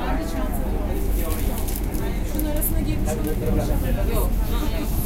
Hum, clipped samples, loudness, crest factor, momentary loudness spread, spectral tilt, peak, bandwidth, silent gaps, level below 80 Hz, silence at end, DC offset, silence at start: none; under 0.1%; -25 LUFS; 14 dB; 3 LU; -6 dB/octave; -8 dBFS; 17 kHz; none; -24 dBFS; 0 s; under 0.1%; 0 s